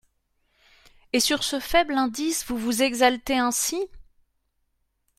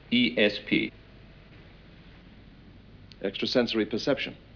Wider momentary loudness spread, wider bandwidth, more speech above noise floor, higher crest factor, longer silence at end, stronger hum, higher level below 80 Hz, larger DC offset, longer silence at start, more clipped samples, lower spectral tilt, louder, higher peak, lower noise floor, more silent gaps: second, 6 LU vs 11 LU; first, 16 kHz vs 5.4 kHz; first, 49 dB vs 24 dB; about the same, 22 dB vs 20 dB; first, 1.15 s vs 0.2 s; neither; first, -50 dBFS vs -56 dBFS; neither; first, 1.15 s vs 0.1 s; neither; second, -1.5 dB/octave vs -5 dB/octave; first, -23 LUFS vs -27 LUFS; first, -4 dBFS vs -10 dBFS; first, -73 dBFS vs -51 dBFS; neither